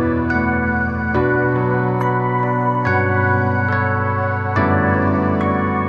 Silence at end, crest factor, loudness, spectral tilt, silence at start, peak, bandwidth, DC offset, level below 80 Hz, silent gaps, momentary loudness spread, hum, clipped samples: 0 s; 14 dB; -17 LUFS; -9.5 dB/octave; 0 s; -4 dBFS; 6.4 kHz; under 0.1%; -42 dBFS; none; 3 LU; none; under 0.1%